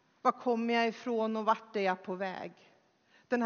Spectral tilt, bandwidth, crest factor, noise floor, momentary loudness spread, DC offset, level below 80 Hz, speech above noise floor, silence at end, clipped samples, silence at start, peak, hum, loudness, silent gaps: -3 dB/octave; 6.8 kHz; 20 dB; -67 dBFS; 8 LU; under 0.1%; -88 dBFS; 35 dB; 0 s; under 0.1%; 0.25 s; -14 dBFS; none; -33 LUFS; none